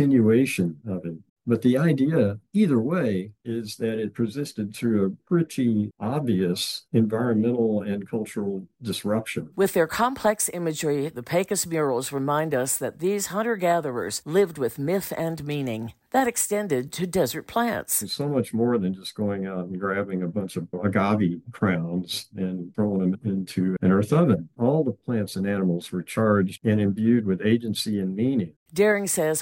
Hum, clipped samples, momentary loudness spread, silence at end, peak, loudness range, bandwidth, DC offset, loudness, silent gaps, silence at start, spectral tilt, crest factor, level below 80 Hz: none; under 0.1%; 8 LU; 0 s; -8 dBFS; 3 LU; 16.5 kHz; under 0.1%; -25 LUFS; 1.30-1.36 s, 28.56-28.66 s; 0 s; -5.5 dB/octave; 16 dB; -62 dBFS